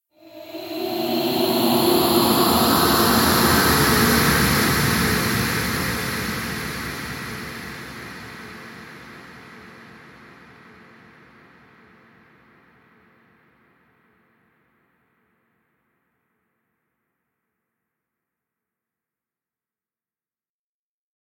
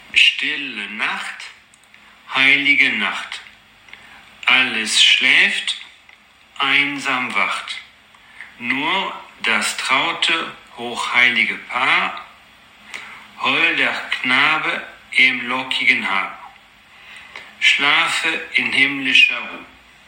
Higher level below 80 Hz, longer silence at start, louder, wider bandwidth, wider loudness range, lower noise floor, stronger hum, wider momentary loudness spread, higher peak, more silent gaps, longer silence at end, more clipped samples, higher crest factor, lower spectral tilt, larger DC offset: first, -42 dBFS vs -66 dBFS; about the same, 0.25 s vs 0.15 s; second, -19 LUFS vs -16 LUFS; about the same, 17 kHz vs 17 kHz; first, 22 LU vs 5 LU; first, under -90 dBFS vs -49 dBFS; neither; first, 23 LU vs 19 LU; about the same, -2 dBFS vs 0 dBFS; neither; first, 11.35 s vs 0.4 s; neither; about the same, 22 dB vs 20 dB; first, -3.5 dB/octave vs -1 dB/octave; neither